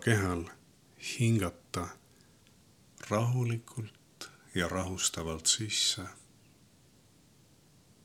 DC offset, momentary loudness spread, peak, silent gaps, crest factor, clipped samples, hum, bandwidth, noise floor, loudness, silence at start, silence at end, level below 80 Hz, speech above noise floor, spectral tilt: under 0.1%; 19 LU; -10 dBFS; none; 24 dB; under 0.1%; none; 16 kHz; -63 dBFS; -32 LUFS; 0 s; 1.85 s; -60 dBFS; 31 dB; -3.5 dB/octave